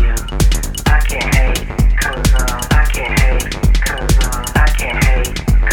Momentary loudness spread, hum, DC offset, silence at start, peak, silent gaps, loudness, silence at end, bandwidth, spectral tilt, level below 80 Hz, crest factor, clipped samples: 2 LU; none; under 0.1%; 0 s; 0 dBFS; none; -15 LUFS; 0 s; 17 kHz; -4.5 dB/octave; -14 dBFS; 12 dB; under 0.1%